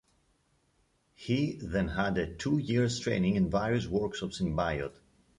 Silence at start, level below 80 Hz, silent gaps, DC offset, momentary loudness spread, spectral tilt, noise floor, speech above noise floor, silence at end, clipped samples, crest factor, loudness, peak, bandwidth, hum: 1.2 s; -50 dBFS; none; under 0.1%; 6 LU; -6 dB/octave; -72 dBFS; 42 dB; 0.45 s; under 0.1%; 16 dB; -31 LUFS; -16 dBFS; 11 kHz; none